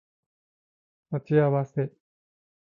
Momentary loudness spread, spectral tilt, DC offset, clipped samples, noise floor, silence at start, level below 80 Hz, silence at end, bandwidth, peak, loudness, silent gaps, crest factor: 12 LU; -10.5 dB/octave; under 0.1%; under 0.1%; under -90 dBFS; 1.1 s; -68 dBFS; 0.9 s; 4 kHz; -10 dBFS; -26 LUFS; none; 20 dB